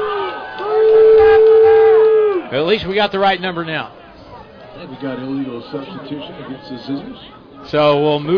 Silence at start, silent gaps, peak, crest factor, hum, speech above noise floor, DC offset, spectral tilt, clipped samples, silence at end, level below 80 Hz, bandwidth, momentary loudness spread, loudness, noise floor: 0 s; none; -4 dBFS; 10 dB; none; 19 dB; under 0.1%; -7.5 dB/octave; under 0.1%; 0 s; -46 dBFS; 5.4 kHz; 21 LU; -13 LUFS; -38 dBFS